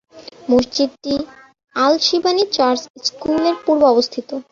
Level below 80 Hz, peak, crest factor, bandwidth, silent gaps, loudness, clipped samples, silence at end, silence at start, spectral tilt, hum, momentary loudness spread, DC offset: -54 dBFS; -2 dBFS; 16 dB; 7.4 kHz; 2.90-2.94 s; -17 LUFS; under 0.1%; 0.1 s; 0.15 s; -3.5 dB/octave; none; 10 LU; under 0.1%